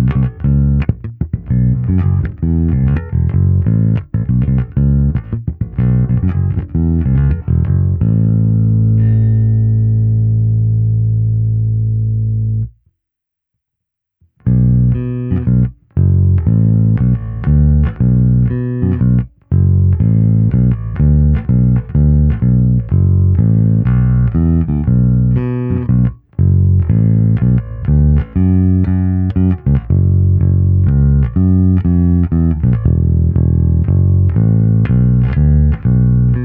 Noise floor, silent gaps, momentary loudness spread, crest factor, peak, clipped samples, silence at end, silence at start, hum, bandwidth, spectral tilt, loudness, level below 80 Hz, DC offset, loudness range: -80 dBFS; none; 5 LU; 12 dB; 0 dBFS; under 0.1%; 0 s; 0 s; none; 3 kHz; -13.5 dB/octave; -13 LUFS; -20 dBFS; under 0.1%; 3 LU